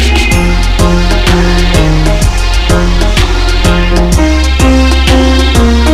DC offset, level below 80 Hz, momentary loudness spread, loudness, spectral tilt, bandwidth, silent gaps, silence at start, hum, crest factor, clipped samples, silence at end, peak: under 0.1%; -8 dBFS; 3 LU; -9 LUFS; -5 dB/octave; 15.5 kHz; none; 0 s; none; 6 dB; 2%; 0 s; 0 dBFS